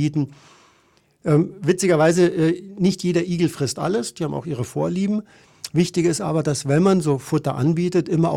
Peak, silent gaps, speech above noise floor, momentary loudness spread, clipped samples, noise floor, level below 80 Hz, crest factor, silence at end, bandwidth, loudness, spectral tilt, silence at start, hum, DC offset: -4 dBFS; none; 40 dB; 9 LU; under 0.1%; -59 dBFS; -56 dBFS; 16 dB; 0 s; 15 kHz; -21 LUFS; -6 dB/octave; 0 s; none; under 0.1%